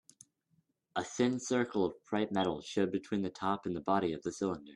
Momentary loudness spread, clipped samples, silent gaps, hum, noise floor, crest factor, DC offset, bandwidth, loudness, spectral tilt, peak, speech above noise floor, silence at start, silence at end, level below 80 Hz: 5 LU; under 0.1%; none; none; -76 dBFS; 18 dB; under 0.1%; 11.5 kHz; -35 LUFS; -5 dB/octave; -16 dBFS; 42 dB; 0.95 s; 0 s; -72 dBFS